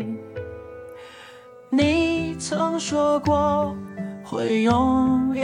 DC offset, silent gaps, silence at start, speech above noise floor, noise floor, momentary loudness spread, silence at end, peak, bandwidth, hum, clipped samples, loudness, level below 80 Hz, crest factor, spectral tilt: under 0.1%; none; 0 s; 24 dB; -45 dBFS; 20 LU; 0 s; -8 dBFS; 11 kHz; none; under 0.1%; -22 LUFS; -48 dBFS; 14 dB; -5.5 dB/octave